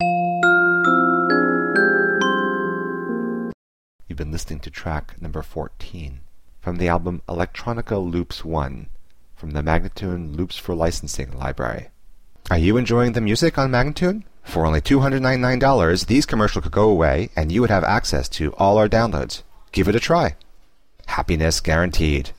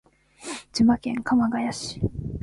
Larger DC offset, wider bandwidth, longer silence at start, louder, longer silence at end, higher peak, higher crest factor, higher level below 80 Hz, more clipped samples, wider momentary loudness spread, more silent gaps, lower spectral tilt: first, 0.7% vs under 0.1%; first, 16.5 kHz vs 11.5 kHz; second, 0 s vs 0.4 s; first, -20 LUFS vs -24 LUFS; about the same, 0 s vs 0 s; first, -4 dBFS vs -8 dBFS; about the same, 16 dB vs 16 dB; first, -32 dBFS vs -44 dBFS; neither; about the same, 14 LU vs 15 LU; first, 3.54-3.99 s vs none; about the same, -5.5 dB/octave vs -5.5 dB/octave